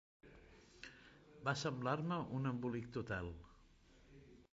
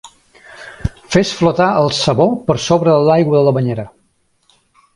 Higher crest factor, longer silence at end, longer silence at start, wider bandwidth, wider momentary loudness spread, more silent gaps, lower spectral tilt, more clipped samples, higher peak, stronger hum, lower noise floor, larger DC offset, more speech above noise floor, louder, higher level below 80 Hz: about the same, 20 dB vs 16 dB; second, 0.1 s vs 1.05 s; first, 0.25 s vs 0.05 s; second, 7.6 kHz vs 11.5 kHz; first, 23 LU vs 14 LU; neither; about the same, -5.5 dB/octave vs -6 dB/octave; neither; second, -24 dBFS vs 0 dBFS; neither; first, -67 dBFS vs -60 dBFS; neither; second, 25 dB vs 47 dB; second, -43 LUFS vs -14 LUFS; second, -64 dBFS vs -38 dBFS